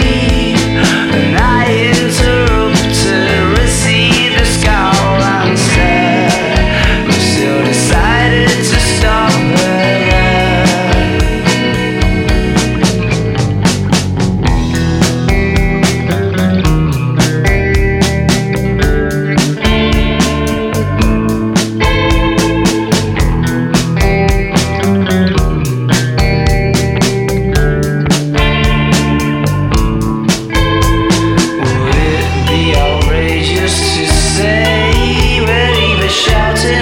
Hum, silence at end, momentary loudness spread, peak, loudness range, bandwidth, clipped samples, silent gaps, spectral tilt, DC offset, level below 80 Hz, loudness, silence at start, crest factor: none; 0 s; 3 LU; 0 dBFS; 2 LU; 17 kHz; under 0.1%; none; -5 dB/octave; under 0.1%; -18 dBFS; -11 LUFS; 0 s; 10 dB